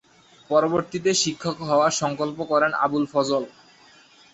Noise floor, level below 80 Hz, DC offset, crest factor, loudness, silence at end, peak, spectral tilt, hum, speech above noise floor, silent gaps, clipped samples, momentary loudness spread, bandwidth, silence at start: -53 dBFS; -64 dBFS; under 0.1%; 18 dB; -22 LUFS; 0.85 s; -6 dBFS; -3.5 dB/octave; none; 30 dB; none; under 0.1%; 7 LU; 8.2 kHz; 0.5 s